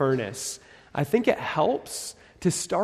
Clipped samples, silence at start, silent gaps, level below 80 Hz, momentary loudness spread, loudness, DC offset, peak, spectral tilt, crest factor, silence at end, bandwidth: under 0.1%; 0 s; none; -60 dBFS; 11 LU; -27 LUFS; under 0.1%; -6 dBFS; -4.5 dB/octave; 20 dB; 0 s; 14 kHz